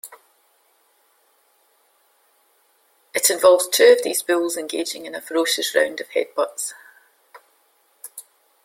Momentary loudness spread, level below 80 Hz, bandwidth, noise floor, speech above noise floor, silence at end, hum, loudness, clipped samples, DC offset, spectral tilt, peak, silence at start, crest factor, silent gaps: 24 LU; -74 dBFS; 16.5 kHz; -62 dBFS; 43 dB; 0.45 s; none; -19 LUFS; under 0.1%; under 0.1%; 0 dB/octave; -2 dBFS; 0.05 s; 22 dB; none